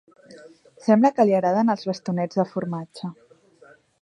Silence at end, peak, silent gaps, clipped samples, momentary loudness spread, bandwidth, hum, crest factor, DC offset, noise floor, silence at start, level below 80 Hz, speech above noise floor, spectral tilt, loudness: 0.9 s; -4 dBFS; none; under 0.1%; 15 LU; 9.6 kHz; none; 18 dB; under 0.1%; -53 dBFS; 0.3 s; -74 dBFS; 32 dB; -7.5 dB/octave; -22 LUFS